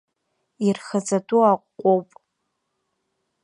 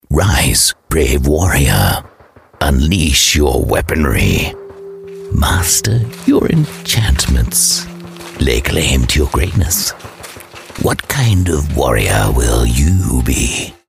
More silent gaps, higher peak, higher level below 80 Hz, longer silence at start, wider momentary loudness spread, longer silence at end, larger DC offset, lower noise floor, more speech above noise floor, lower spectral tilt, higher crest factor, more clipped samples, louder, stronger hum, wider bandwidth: neither; second, -6 dBFS vs 0 dBFS; second, -78 dBFS vs -20 dBFS; first, 0.6 s vs 0.1 s; second, 6 LU vs 17 LU; first, 1.4 s vs 0.15 s; neither; first, -76 dBFS vs -33 dBFS; first, 56 dB vs 20 dB; first, -6 dB/octave vs -4 dB/octave; about the same, 18 dB vs 14 dB; neither; second, -21 LUFS vs -13 LUFS; neither; second, 11 kHz vs 15.5 kHz